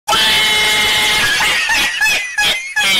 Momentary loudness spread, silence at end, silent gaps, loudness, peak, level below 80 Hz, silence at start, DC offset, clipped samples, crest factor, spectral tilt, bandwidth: 4 LU; 0 s; none; -11 LUFS; -6 dBFS; -40 dBFS; 0.05 s; under 0.1%; under 0.1%; 8 dB; 0.5 dB/octave; 16.5 kHz